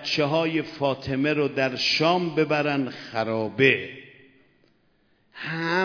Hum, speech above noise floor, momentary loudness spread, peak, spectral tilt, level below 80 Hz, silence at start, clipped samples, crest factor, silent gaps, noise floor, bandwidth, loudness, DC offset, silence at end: none; 40 dB; 10 LU; -4 dBFS; -5.5 dB/octave; -62 dBFS; 0 s; under 0.1%; 20 dB; none; -64 dBFS; 5.4 kHz; -24 LUFS; under 0.1%; 0 s